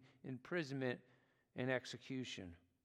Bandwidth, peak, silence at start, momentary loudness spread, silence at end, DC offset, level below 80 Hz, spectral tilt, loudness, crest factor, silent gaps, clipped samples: 11 kHz; -26 dBFS; 0 s; 11 LU; 0.3 s; under 0.1%; -80 dBFS; -5.5 dB/octave; -45 LUFS; 22 dB; none; under 0.1%